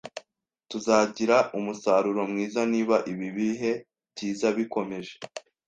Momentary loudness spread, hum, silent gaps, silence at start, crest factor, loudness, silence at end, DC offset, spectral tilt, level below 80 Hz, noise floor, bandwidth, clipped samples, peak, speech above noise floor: 16 LU; none; none; 0.05 s; 20 dB; -26 LUFS; 0.3 s; under 0.1%; -5 dB/octave; -70 dBFS; -68 dBFS; 9.4 kHz; under 0.1%; -6 dBFS; 42 dB